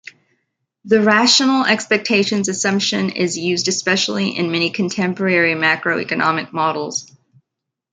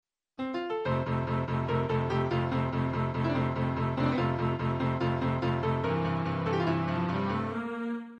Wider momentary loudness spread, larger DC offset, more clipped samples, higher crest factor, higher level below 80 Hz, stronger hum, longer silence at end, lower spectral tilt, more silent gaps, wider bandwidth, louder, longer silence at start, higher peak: first, 7 LU vs 4 LU; neither; neither; about the same, 18 dB vs 14 dB; second, -64 dBFS vs -52 dBFS; neither; first, 0.9 s vs 0 s; second, -3.5 dB/octave vs -8.5 dB/octave; neither; first, 9.6 kHz vs 6.8 kHz; first, -16 LUFS vs -30 LUFS; first, 0.85 s vs 0.4 s; first, 0 dBFS vs -16 dBFS